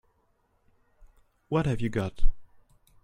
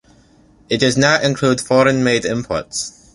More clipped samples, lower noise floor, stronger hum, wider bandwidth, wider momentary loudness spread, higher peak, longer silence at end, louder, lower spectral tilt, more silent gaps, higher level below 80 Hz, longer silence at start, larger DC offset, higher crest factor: neither; first, -70 dBFS vs -50 dBFS; neither; second, 6.8 kHz vs 11.5 kHz; about the same, 9 LU vs 9 LU; second, -8 dBFS vs 0 dBFS; first, 0.6 s vs 0.25 s; second, -31 LUFS vs -16 LUFS; first, -7.5 dB/octave vs -4.5 dB/octave; neither; first, -34 dBFS vs -48 dBFS; first, 1.5 s vs 0.7 s; neither; about the same, 20 dB vs 16 dB